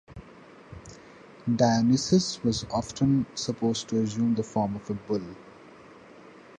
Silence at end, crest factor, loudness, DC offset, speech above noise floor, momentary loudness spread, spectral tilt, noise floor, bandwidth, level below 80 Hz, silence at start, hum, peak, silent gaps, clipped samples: 0.3 s; 18 dB; -27 LUFS; under 0.1%; 24 dB; 24 LU; -5.5 dB/octave; -50 dBFS; 10 kHz; -56 dBFS; 0.1 s; none; -10 dBFS; none; under 0.1%